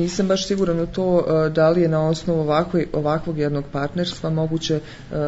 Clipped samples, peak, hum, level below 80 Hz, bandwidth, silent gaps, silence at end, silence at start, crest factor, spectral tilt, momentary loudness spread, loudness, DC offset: under 0.1%; -6 dBFS; none; -44 dBFS; 8 kHz; none; 0 s; 0 s; 14 dB; -6.5 dB/octave; 7 LU; -21 LUFS; under 0.1%